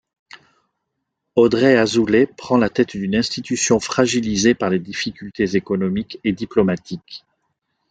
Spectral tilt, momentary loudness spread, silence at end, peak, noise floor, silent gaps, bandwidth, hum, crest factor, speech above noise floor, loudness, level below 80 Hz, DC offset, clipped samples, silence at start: -4.5 dB/octave; 11 LU; 0.75 s; -2 dBFS; -77 dBFS; none; 9.4 kHz; none; 18 dB; 59 dB; -18 LUFS; -50 dBFS; under 0.1%; under 0.1%; 1.35 s